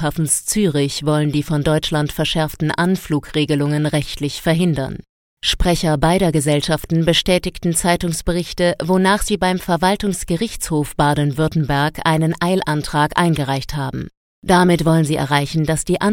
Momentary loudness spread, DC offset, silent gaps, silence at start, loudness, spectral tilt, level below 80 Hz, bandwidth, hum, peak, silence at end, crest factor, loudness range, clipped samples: 6 LU; under 0.1%; 5.09-5.37 s, 14.17-14.42 s; 0 s; -18 LUFS; -5 dB/octave; -34 dBFS; 17.5 kHz; none; 0 dBFS; 0 s; 18 dB; 2 LU; under 0.1%